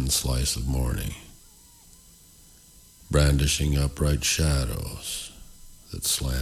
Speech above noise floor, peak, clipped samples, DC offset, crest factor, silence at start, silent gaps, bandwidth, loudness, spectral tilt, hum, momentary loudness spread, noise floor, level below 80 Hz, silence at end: 28 dB; -8 dBFS; under 0.1%; under 0.1%; 18 dB; 0 s; none; 19 kHz; -25 LUFS; -4 dB/octave; none; 12 LU; -52 dBFS; -32 dBFS; 0 s